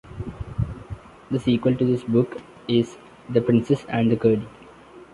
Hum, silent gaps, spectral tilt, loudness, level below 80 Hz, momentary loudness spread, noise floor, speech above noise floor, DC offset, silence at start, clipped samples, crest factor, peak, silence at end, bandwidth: none; none; -8 dB/octave; -23 LUFS; -44 dBFS; 17 LU; -46 dBFS; 25 dB; under 0.1%; 0.05 s; under 0.1%; 18 dB; -4 dBFS; 0.1 s; 11 kHz